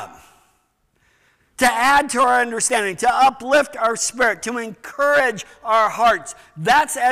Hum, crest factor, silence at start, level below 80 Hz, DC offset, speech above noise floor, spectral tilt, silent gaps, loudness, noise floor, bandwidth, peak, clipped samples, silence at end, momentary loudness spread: none; 12 dB; 0 s; -54 dBFS; 0.2%; 47 dB; -2 dB/octave; none; -17 LUFS; -65 dBFS; 16 kHz; -8 dBFS; under 0.1%; 0 s; 10 LU